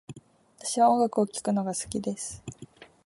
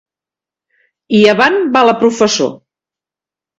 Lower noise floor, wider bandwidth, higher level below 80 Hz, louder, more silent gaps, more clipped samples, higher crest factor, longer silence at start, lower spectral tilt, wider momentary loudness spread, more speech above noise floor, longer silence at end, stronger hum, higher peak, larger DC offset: second, -53 dBFS vs -88 dBFS; first, 11.5 kHz vs 8 kHz; second, -62 dBFS vs -56 dBFS; second, -27 LUFS vs -11 LUFS; neither; neither; about the same, 18 dB vs 14 dB; second, 0.1 s vs 1.1 s; about the same, -5 dB/octave vs -4 dB/octave; first, 22 LU vs 7 LU; second, 26 dB vs 78 dB; second, 0.2 s vs 1.05 s; neither; second, -10 dBFS vs 0 dBFS; neither